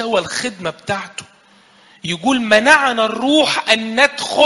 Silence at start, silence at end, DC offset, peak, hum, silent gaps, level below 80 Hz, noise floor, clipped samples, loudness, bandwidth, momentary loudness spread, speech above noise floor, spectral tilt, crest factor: 0 s; 0 s; under 0.1%; 0 dBFS; none; none; -56 dBFS; -49 dBFS; under 0.1%; -15 LUFS; 11.5 kHz; 14 LU; 34 dB; -3 dB/octave; 16 dB